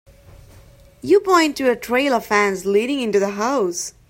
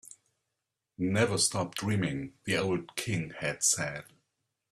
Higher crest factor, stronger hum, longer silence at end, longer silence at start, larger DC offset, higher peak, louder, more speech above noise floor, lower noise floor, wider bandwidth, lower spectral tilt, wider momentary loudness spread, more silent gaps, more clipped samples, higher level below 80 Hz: about the same, 18 dB vs 20 dB; neither; second, 0.2 s vs 0.7 s; first, 1.05 s vs 0.05 s; neither; first, -2 dBFS vs -12 dBFS; first, -18 LUFS vs -30 LUFS; second, 28 dB vs 55 dB; second, -47 dBFS vs -86 dBFS; first, 16.5 kHz vs 14.5 kHz; about the same, -3.5 dB/octave vs -3.5 dB/octave; second, 6 LU vs 9 LU; neither; neither; first, -52 dBFS vs -64 dBFS